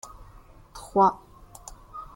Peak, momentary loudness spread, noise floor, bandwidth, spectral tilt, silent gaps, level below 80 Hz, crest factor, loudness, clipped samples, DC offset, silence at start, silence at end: -8 dBFS; 24 LU; -50 dBFS; 17 kHz; -6 dB/octave; none; -52 dBFS; 20 dB; -23 LUFS; under 0.1%; under 0.1%; 0.75 s; 0.15 s